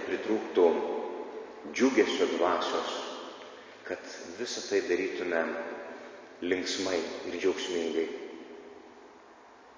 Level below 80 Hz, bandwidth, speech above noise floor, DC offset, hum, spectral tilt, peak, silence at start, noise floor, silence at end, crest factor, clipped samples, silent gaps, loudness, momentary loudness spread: -70 dBFS; 7.8 kHz; 24 dB; under 0.1%; none; -3 dB/octave; -12 dBFS; 0 s; -54 dBFS; 0.05 s; 20 dB; under 0.1%; none; -31 LUFS; 20 LU